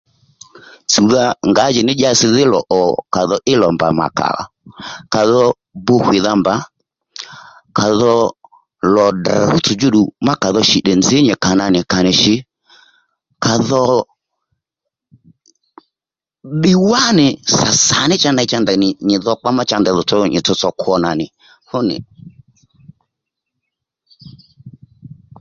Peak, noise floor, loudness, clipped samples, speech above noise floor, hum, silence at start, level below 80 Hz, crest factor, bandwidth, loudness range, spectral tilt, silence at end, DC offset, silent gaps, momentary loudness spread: 0 dBFS; -89 dBFS; -13 LUFS; under 0.1%; 76 dB; none; 0.9 s; -48 dBFS; 16 dB; 7.8 kHz; 7 LU; -4 dB/octave; 0.35 s; under 0.1%; none; 10 LU